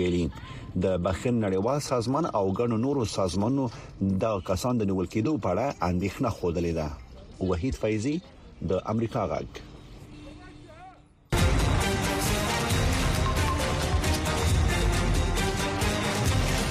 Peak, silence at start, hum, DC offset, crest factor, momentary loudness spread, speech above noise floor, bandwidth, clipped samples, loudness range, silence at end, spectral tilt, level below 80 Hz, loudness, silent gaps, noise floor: -12 dBFS; 0 s; none; under 0.1%; 14 dB; 13 LU; 24 dB; 15.5 kHz; under 0.1%; 5 LU; 0 s; -5.5 dB/octave; -34 dBFS; -27 LUFS; none; -51 dBFS